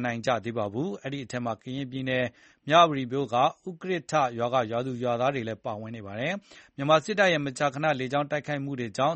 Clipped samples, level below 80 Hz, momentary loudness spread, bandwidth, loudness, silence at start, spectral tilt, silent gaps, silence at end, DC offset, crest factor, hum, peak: under 0.1%; -66 dBFS; 11 LU; 8.4 kHz; -27 LUFS; 0 s; -5.5 dB/octave; none; 0 s; under 0.1%; 22 dB; none; -6 dBFS